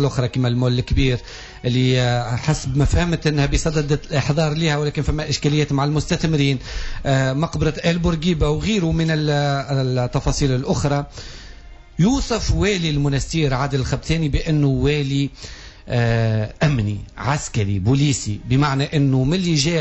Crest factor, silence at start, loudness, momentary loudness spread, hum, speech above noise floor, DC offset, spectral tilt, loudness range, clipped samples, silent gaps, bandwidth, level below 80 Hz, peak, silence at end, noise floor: 12 dB; 0 s; -20 LUFS; 6 LU; none; 20 dB; under 0.1%; -6 dB/octave; 2 LU; under 0.1%; none; 8.2 kHz; -30 dBFS; -6 dBFS; 0 s; -39 dBFS